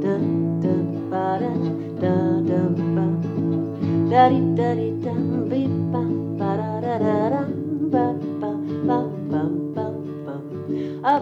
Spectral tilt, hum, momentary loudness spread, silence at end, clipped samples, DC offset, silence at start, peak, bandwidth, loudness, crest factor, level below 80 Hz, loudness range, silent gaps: -10 dB/octave; none; 7 LU; 0 s; under 0.1%; under 0.1%; 0 s; -2 dBFS; 5.8 kHz; -23 LUFS; 20 dB; -68 dBFS; 4 LU; none